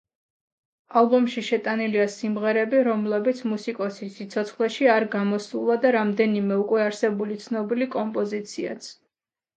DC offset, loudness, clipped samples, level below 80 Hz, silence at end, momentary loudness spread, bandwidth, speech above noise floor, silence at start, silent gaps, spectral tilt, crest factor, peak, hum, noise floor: under 0.1%; -24 LUFS; under 0.1%; -76 dBFS; 0.65 s; 10 LU; 9 kHz; 61 dB; 0.9 s; none; -6 dB/octave; 18 dB; -6 dBFS; none; -84 dBFS